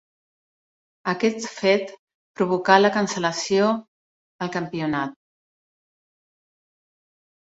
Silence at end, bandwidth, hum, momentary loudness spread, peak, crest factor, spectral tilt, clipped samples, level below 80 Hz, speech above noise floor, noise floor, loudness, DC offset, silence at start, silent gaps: 2.45 s; 8 kHz; none; 13 LU; -2 dBFS; 24 dB; -4.5 dB/octave; under 0.1%; -66 dBFS; over 69 dB; under -90 dBFS; -22 LUFS; under 0.1%; 1.05 s; 1.99-2.08 s, 2.14-2.34 s, 3.88-4.39 s